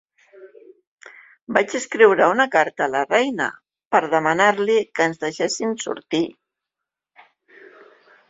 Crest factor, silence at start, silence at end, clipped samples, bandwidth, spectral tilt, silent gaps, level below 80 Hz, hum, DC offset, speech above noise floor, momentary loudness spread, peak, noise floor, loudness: 20 dB; 0.4 s; 2 s; under 0.1%; 8 kHz; -3.5 dB/octave; 0.87-0.98 s, 1.42-1.47 s, 3.87-3.91 s; -68 dBFS; none; under 0.1%; 66 dB; 9 LU; 0 dBFS; -85 dBFS; -19 LUFS